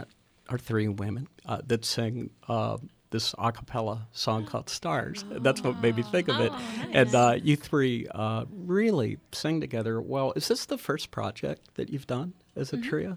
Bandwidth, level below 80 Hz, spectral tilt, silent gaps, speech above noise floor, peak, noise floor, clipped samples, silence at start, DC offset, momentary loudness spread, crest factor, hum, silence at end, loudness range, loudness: 20 kHz; -60 dBFS; -5.5 dB/octave; none; 20 dB; -6 dBFS; -48 dBFS; under 0.1%; 0 s; under 0.1%; 11 LU; 22 dB; none; 0 s; 6 LU; -29 LUFS